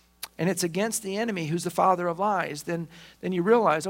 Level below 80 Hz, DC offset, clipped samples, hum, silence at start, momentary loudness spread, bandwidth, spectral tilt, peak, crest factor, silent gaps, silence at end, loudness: -66 dBFS; under 0.1%; under 0.1%; none; 0.2 s; 11 LU; 16.5 kHz; -5 dB/octave; -8 dBFS; 18 dB; none; 0 s; -26 LUFS